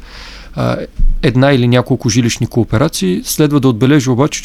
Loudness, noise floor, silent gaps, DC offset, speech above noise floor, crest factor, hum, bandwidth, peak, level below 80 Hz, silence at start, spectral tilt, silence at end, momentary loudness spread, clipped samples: -13 LUFS; -31 dBFS; none; under 0.1%; 20 dB; 12 dB; none; 15.5 kHz; 0 dBFS; -22 dBFS; 0 s; -5.5 dB/octave; 0 s; 9 LU; under 0.1%